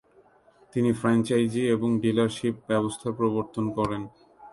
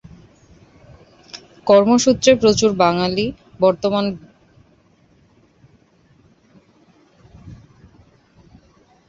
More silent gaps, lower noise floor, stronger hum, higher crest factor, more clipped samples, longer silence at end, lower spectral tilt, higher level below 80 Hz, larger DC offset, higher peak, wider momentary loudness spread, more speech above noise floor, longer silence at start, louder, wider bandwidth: neither; first, -59 dBFS vs -55 dBFS; neither; about the same, 16 dB vs 20 dB; neither; second, 0.05 s vs 1.55 s; first, -6.5 dB/octave vs -4.5 dB/octave; second, -58 dBFS vs -50 dBFS; neither; second, -10 dBFS vs -2 dBFS; second, 7 LU vs 22 LU; second, 34 dB vs 40 dB; second, 0.75 s vs 1.35 s; second, -26 LUFS vs -16 LUFS; first, 11.5 kHz vs 8 kHz